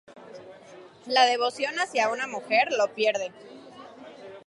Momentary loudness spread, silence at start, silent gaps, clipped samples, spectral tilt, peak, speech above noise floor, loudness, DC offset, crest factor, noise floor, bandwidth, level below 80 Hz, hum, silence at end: 24 LU; 0.1 s; none; under 0.1%; -1.5 dB/octave; -8 dBFS; 23 dB; -25 LUFS; under 0.1%; 20 dB; -49 dBFS; 11.5 kHz; -80 dBFS; none; 0.05 s